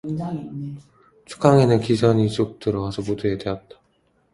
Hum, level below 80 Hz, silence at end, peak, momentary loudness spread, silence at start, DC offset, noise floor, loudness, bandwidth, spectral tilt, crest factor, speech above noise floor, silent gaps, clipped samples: none; -50 dBFS; 0.75 s; 0 dBFS; 17 LU; 0.05 s; under 0.1%; -64 dBFS; -21 LUFS; 11.5 kHz; -7.5 dB/octave; 22 dB; 43 dB; none; under 0.1%